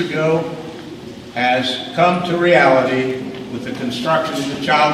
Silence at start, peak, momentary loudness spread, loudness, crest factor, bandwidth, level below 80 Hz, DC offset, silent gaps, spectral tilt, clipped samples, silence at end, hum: 0 s; 0 dBFS; 17 LU; -17 LUFS; 18 dB; 15 kHz; -54 dBFS; under 0.1%; none; -5 dB/octave; under 0.1%; 0 s; none